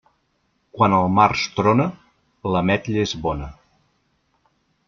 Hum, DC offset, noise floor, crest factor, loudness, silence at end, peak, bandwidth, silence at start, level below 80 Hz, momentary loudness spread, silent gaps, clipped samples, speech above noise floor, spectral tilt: none; under 0.1%; -68 dBFS; 20 dB; -20 LUFS; 1.35 s; -2 dBFS; 7.4 kHz; 0.75 s; -46 dBFS; 12 LU; none; under 0.1%; 49 dB; -6 dB/octave